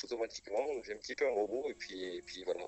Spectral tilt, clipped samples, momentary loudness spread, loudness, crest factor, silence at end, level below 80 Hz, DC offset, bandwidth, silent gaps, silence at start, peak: -3 dB/octave; under 0.1%; 9 LU; -39 LUFS; 16 dB; 0 s; -70 dBFS; under 0.1%; 8.2 kHz; none; 0 s; -22 dBFS